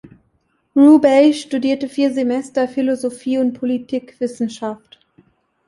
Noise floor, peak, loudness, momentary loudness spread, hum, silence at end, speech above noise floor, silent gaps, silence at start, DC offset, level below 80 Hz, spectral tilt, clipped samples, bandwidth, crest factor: -64 dBFS; -2 dBFS; -17 LUFS; 15 LU; none; 0.9 s; 48 dB; none; 0.75 s; under 0.1%; -62 dBFS; -5 dB/octave; under 0.1%; 11.5 kHz; 16 dB